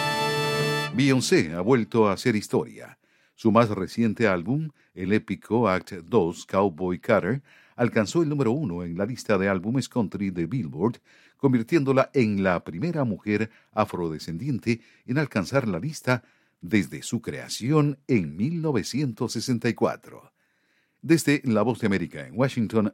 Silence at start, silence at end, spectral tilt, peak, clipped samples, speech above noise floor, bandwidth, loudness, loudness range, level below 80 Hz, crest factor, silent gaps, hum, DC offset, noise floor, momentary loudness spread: 0 s; 0 s; -6 dB/octave; -4 dBFS; under 0.1%; 44 dB; 16.5 kHz; -25 LUFS; 4 LU; -60 dBFS; 20 dB; none; none; under 0.1%; -69 dBFS; 8 LU